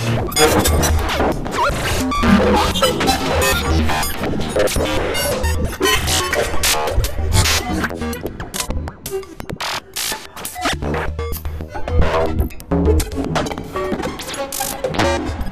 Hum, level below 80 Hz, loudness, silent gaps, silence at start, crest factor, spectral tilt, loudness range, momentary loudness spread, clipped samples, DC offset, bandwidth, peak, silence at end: none; -26 dBFS; -18 LUFS; none; 0 s; 18 dB; -4 dB/octave; 7 LU; 11 LU; under 0.1%; under 0.1%; 16 kHz; 0 dBFS; 0 s